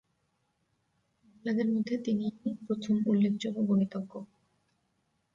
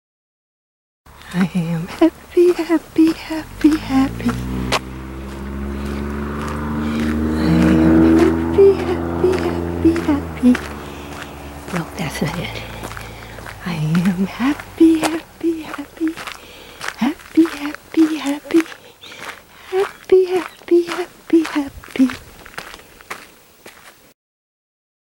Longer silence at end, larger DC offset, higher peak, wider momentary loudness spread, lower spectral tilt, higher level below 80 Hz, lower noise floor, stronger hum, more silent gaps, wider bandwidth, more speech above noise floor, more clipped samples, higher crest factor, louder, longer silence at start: about the same, 1.1 s vs 1.15 s; neither; second, -18 dBFS vs -2 dBFS; second, 12 LU vs 19 LU; about the same, -7.5 dB/octave vs -6.5 dB/octave; second, -74 dBFS vs -38 dBFS; first, -77 dBFS vs -44 dBFS; neither; neither; second, 7.4 kHz vs 16.5 kHz; first, 47 dB vs 27 dB; neither; about the same, 16 dB vs 18 dB; second, -31 LUFS vs -18 LUFS; first, 1.45 s vs 1.2 s